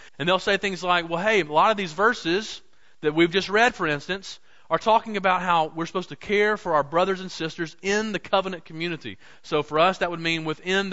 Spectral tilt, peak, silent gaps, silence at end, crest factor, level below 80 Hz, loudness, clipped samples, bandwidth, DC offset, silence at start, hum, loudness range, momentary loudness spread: -4.5 dB/octave; -6 dBFS; none; 0 s; 18 dB; -56 dBFS; -23 LUFS; under 0.1%; 8 kHz; 0.4%; 0.05 s; none; 3 LU; 11 LU